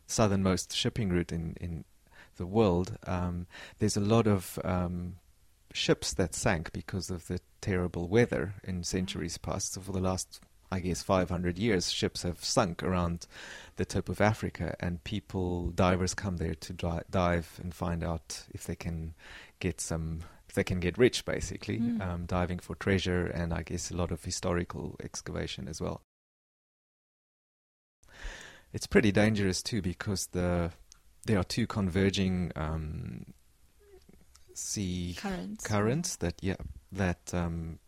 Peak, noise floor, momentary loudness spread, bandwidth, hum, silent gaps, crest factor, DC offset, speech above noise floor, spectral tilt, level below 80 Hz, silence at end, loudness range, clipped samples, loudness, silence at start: -10 dBFS; -62 dBFS; 13 LU; 16 kHz; none; 26.04-28.03 s; 22 dB; under 0.1%; 30 dB; -5 dB/octave; -48 dBFS; 0.1 s; 6 LU; under 0.1%; -32 LUFS; 0.1 s